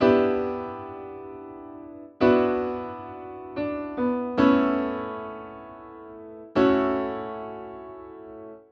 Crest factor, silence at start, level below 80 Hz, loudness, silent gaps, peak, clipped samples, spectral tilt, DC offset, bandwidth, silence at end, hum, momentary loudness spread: 20 dB; 0 s; -56 dBFS; -25 LUFS; none; -6 dBFS; under 0.1%; -8 dB/octave; under 0.1%; 6.2 kHz; 0.1 s; none; 22 LU